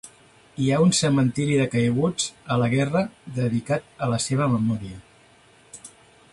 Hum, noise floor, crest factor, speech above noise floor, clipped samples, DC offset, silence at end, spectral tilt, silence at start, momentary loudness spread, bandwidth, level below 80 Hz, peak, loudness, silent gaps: none; -54 dBFS; 16 dB; 32 dB; under 0.1%; under 0.1%; 0.45 s; -5.5 dB/octave; 0.05 s; 13 LU; 11.5 kHz; -54 dBFS; -8 dBFS; -23 LUFS; none